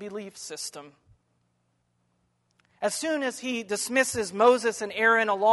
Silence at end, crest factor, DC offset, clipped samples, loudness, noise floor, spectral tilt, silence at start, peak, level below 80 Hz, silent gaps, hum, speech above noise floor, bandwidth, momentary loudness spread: 0 s; 20 dB; under 0.1%; under 0.1%; -25 LUFS; -73 dBFS; -2.5 dB/octave; 0 s; -6 dBFS; -68 dBFS; none; none; 47 dB; 11.5 kHz; 16 LU